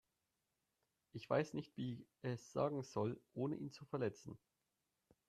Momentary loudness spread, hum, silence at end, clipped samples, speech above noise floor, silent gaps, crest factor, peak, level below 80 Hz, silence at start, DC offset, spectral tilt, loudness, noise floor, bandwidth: 16 LU; none; 0.9 s; under 0.1%; 45 dB; none; 22 dB; -24 dBFS; -80 dBFS; 1.15 s; under 0.1%; -7 dB/octave; -44 LUFS; -89 dBFS; 13 kHz